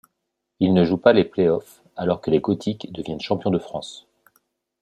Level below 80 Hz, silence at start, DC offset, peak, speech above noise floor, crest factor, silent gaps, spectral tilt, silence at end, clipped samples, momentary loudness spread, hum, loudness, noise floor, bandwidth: -58 dBFS; 0.6 s; under 0.1%; -2 dBFS; 58 dB; 20 dB; none; -7.5 dB/octave; 0.85 s; under 0.1%; 15 LU; none; -21 LUFS; -78 dBFS; 13 kHz